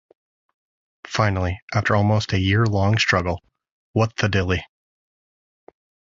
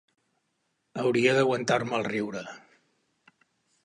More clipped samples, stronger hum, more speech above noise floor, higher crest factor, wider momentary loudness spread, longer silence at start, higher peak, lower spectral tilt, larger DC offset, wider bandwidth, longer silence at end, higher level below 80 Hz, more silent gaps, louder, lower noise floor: neither; neither; first, over 70 dB vs 50 dB; about the same, 20 dB vs 20 dB; second, 8 LU vs 17 LU; about the same, 1.05 s vs 0.95 s; first, -4 dBFS vs -10 dBFS; about the same, -6 dB/octave vs -5 dB/octave; neither; second, 7.6 kHz vs 11 kHz; first, 1.45 s vs 1.25 s; first, -38 dBFS vs -72 dBFS; first, 1.62-1.68 s, 3.71-3.94 s vs none; first, -21 LUFS vs -26 LUFS; first, under -90 dBFS vs -77 dBFS